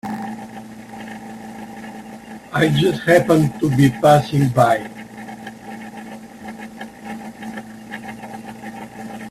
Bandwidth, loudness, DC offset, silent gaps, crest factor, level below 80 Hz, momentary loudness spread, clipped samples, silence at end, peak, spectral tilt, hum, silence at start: 14.5 kHz; -16 LUFS; under 0.1%; none; 20 dB; -52 dBFS; 21 LU; under 0.1%; 0 s; 0 dBFS; -6.5 dB/octave; none; 0.05 s